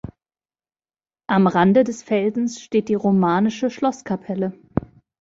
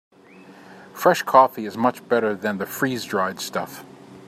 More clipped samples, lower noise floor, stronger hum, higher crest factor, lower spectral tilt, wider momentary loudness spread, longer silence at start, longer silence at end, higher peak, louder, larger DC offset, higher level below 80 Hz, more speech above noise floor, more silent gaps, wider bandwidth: neither; first, under -90 dBFS vs -47 dBFS; neither; about the same, 18 dB vs 22 dB; first, -7 dB/octave vs -4.5 dB/octave; about the same, 12 LU vs 13 LU; second, 0.05 s vs 0.5 s; first, 0.4 s vs 0 s; about the same, -4 dBFS vs -2 dBFS; about the same, -20 LUFS vs -21 LUFS; neither; first, -52 dBFS vs -70 dBFS; first, over 71 dB vs 26 dB; neither; second, 7.8 kHz vs 16 kHz